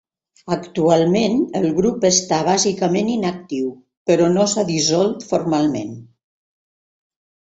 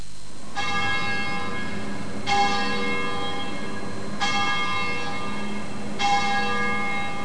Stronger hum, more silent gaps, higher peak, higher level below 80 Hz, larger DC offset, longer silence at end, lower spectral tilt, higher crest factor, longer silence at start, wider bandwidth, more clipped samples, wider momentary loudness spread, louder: neither; first, 3.97-4.05 s vs none; first, -2 dBFS vs -8 dBFS; about the same, -56 dBFS vs -52 dBFS; second, under 0.1% vs 6%; first, 1.4 s vs 0 s; about the same, -4.5 dB/octave vs -3.5 dB/octave; about the same, 18 dB vs 16 dB; first, 0.45 s vs 0 s; second, 8.2 kHz vs 10.5 kHz; neither; about the same, 10 LU vs 10 LU; first, -18 LUFS vs -26 LUFS